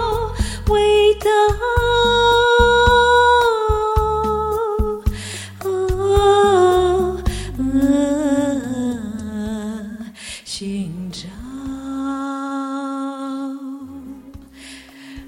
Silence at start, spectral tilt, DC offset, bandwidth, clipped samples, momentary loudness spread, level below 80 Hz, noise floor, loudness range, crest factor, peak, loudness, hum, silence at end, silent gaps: 0 s; -5 dB/octave; under 0.1%; 16.5 kHz; under 0.1%; 19 LU; -30 dBFS; -39 dBFS; 13 LU; 18 dB; 0 dBFS; -17 LUFS; none; 0 s; none